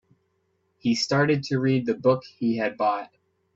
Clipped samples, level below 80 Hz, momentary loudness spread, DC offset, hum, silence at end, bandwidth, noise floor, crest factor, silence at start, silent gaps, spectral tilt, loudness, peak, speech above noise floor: under 0.1%; -64 dBFS; 7 LU; under 0.1%; none; 0.5 s; 7.8 kHz; -71 dBFS; 18 dB; 0.85 s; none; -6 dB/octave; -24 LUFS; -8 dBFS; 48 dB